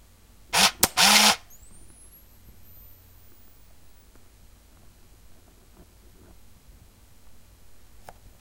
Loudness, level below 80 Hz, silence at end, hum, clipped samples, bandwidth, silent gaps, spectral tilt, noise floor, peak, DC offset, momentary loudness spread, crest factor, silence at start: -18 LUFS; -54 dBFS; 7.05 s; none; under 0.1%; 16 kHz; none; 0 dB/octave; -54 dBFS; 0 dBFS; 0.2%; 10 LU; 28 dB; 0.55 s